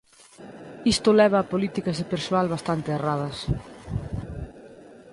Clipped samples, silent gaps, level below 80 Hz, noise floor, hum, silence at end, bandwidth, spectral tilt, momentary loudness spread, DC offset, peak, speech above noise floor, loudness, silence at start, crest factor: under 0.1%; none; -44 dBFS; -47 dBFS; none; 0 s; 11.5 kHz; -5.5 dB/octave; 20 LU; under 0.1%; -8 dBFS; 24 dB; -25 LUFS; 0.4 s; 18 dB